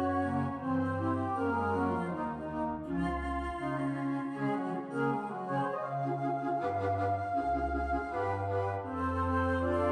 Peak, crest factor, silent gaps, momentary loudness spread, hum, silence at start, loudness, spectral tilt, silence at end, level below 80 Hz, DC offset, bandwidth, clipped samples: -20 dBFS; 14 dB; none; 5 LU; none; 0 s; -33 LUFS; -8.5 dB/octave; 0 s; -48 dBFS; under 0.1%; 9.6 kHz; under 0.1%